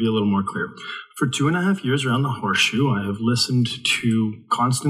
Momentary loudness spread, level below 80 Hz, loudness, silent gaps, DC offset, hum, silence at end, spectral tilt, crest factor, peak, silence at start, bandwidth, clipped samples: 8 LU; -62 dBFS; -21 LUFS; none; under 0.1%; none; 0 s; -5 dB/octave; 16 dB; -4 dBFS; 0 s; 15 kHz; under 0.1%